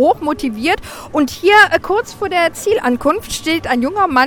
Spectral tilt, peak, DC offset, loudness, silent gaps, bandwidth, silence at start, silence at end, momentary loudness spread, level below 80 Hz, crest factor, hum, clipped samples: -3.5 dB/octave; 0 dBFS; under 0.1%; -15 LUFS; none; 19.5 kHz; 0 s; 0 s; 10 LU; -42 dBFS; 14 dB; none; under 0.1%